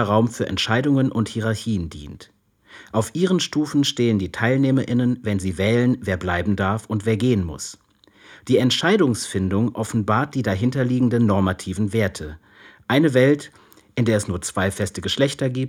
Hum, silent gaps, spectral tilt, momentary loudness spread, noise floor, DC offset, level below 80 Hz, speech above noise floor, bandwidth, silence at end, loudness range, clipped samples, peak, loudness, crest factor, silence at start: none; none; -5.5 dB/octave; 8 LU; -50 dBFS; under 0.1%; -52 dBFS; 30 dB; 16 kHz; 0 s; 3 LU; under 0.1%; -4 dBFS; -21 LUFS; 16 dB; 0 s